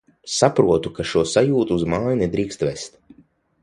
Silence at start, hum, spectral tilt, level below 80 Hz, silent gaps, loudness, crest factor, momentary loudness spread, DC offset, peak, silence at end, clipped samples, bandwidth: 0.25 s; none; -5 dB/octave; -46 dBFS; none; -20 LUFS; 20 dB; 9 LU; under 0.1%; 0 dBFS; 0.75 s; under 0.1%; 11.5 kHz